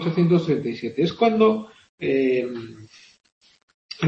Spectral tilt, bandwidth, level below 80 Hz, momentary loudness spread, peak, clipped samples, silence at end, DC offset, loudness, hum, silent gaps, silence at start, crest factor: -8 dB/octave; 7.6 kHz; -64 dBFS; 15 LU; -4 dBFS; under 0.1%; 0 s; under 0.1%; -22 LUFS; none; 1.89-1.98 s, 3.32-3.41 s, 3.63-3.68 s, 3.74-3.89 s; 0 s; 18 dB